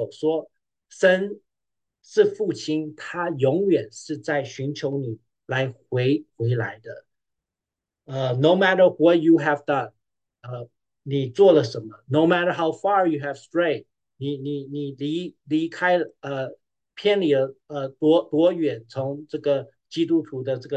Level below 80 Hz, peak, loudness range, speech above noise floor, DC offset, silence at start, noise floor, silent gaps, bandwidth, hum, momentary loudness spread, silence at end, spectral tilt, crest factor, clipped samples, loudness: -70 dBFS; -4 dBFS; 6 LU; 65 dB; under 0.1%; 0 s; -87 dBFS; none; 8.8 kHz; none; 14 LU; 0 s; -6.5 dB/octave; 18 dB; under 0.1%; -23 LUFS